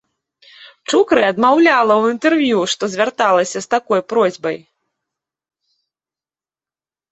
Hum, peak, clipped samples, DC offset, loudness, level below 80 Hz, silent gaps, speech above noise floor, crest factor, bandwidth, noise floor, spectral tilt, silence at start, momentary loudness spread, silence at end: none; 0 dBFS; under 0.1%; under 0.1%; -15 LUFS; -62 dBFS; none; over 75 dB; 16 dB; 8.2 kHz; under -90 dBFS; -4 dB/octave; 0.6 s; 8 LU; 2.55 s